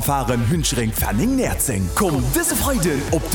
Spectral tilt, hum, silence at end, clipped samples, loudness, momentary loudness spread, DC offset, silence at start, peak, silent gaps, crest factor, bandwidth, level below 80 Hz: -4.5 dB/octave; none; 0 s; under 0.1%; -19 LUFS; 2 LU; under 0.1%; 0 s; -6 dBFS; none; 14 dB; over 20 kHz; -30 dBFS